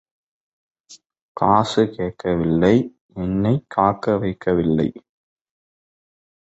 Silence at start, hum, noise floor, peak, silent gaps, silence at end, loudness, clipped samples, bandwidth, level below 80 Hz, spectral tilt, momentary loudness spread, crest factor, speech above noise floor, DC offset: 0.9 s; none; -50 dBFS; -2 dBFS; 1.22-1.35 s, 3.01-3.09 s; 1.5 s; -20 LUFS; under 0.1%; 8.2 kHz; -46 dBFS; -7.5 dB/octave; 9 LU; 20 dB; 31 dB; under 0.1%